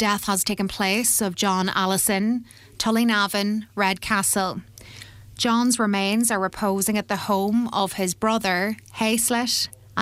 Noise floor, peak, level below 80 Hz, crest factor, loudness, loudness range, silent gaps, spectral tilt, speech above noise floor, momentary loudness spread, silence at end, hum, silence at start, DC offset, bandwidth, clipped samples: -43 dBFS; -6 dBFS; -54 dBFS; 16 dB; -22 LUFS; 1 LU; none; -3 dB/octave; 20 dB; 7 LU; 0 s; none; 0 s; under 0.1%; 16 kHz; under 0.1%